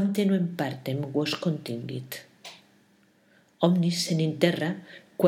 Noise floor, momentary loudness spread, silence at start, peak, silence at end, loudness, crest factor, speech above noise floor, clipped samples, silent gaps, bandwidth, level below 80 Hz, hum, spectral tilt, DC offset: -62 dBFS; 16 LU; 0 s; -6 dBFS; 0 s; -27 LUFS; 22 dB; 36 dB; under 0.1%; none; 16 kHz; -78 dBFS; none; -6 dB/octave; under 0.1%